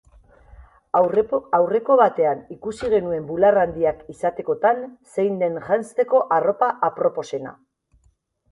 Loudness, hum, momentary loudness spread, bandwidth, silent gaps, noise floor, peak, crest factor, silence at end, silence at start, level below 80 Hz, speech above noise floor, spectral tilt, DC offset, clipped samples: -21 LUFS; none; 11 LU; 11.5 kHz; none; -63 dBFS; -4 dBFS; 18 dB; 1 s; 0.6 s; -54 dBFS; 43 dB; -6.5 dB/octave; under 0.1%; under 0.1%